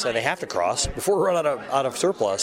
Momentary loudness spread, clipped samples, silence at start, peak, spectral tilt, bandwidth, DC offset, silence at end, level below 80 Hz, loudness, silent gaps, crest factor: 4 LU; under 0.1%; 0 s; -6 dBFS; -3 dB/octave; 16 kHz; under 0.1%; 0 s; -44 dBFS; -23 LUFS; none; 16 dB